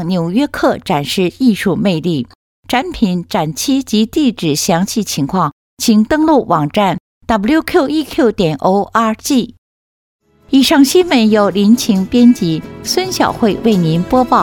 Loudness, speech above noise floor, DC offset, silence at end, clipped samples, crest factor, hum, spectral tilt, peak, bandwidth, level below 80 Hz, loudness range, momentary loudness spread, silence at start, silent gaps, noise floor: -13 LUFS; over 78 dB; under 0.1%; 0 s; under 0.1%; 12 dB; none; -5 dB/octave; 0 dBFS; 18.5 kHz; -42 dBFS; 4 LU; 7 LU; 0 s; 2.35-2.63 s, 5.52-5.77 s, 7.00-7.21 s, 9.58-10.19 s; under -90 dBFS